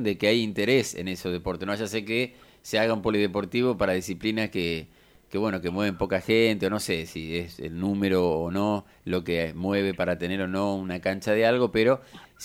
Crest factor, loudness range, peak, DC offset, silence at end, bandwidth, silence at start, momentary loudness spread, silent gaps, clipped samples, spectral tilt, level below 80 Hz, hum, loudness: 18 dB; 2 LU; -8 dBFS; under 0.1%; 0 s; 16.5 kHz; 0 s; 9 LU; none; under 0.1%; -5.5 dB/octave; -52 dBFS; none; -26 LUFS